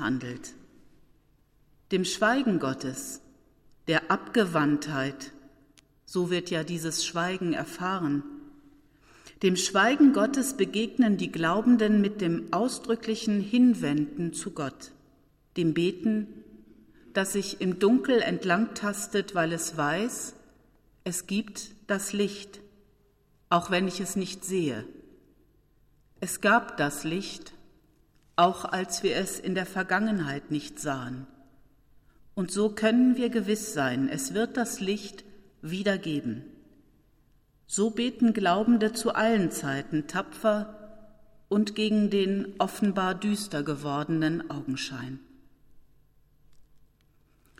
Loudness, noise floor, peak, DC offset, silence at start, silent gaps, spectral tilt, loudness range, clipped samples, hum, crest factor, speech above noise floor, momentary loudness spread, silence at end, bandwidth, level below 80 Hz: -27 LUFS; -65 dBFS; -10 dBFS; under 0.1%; 0 s; none; -4.5 dB/octave; 6 LU; under 0.1%; 50 Hz at -65 dBFS; 18 dB; 38 dB; 14 LU; 0.85 s; 15.5 kHz; -62 dBFS